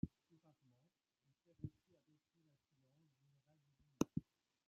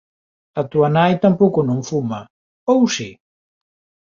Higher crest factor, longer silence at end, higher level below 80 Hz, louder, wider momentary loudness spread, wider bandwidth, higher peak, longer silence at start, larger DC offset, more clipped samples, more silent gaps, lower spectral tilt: first, 30 dB vs 18 dB; second, 0.45 s vs 1.05 s; second, -72 dBFS vs -58 dBFS; second, -48 LUFS vs -17 LUFS; about the same, 12 LU vs 13 LU; about the same, 7 kHz vs 7.6 kHz; second, -24 dBFS vs -2 dBFS; second, 0.05 s vs 0.55 s; neither; neither; second, none vs 2.30-2.67 s; first, -8 dB/octave vs -6 dB/octave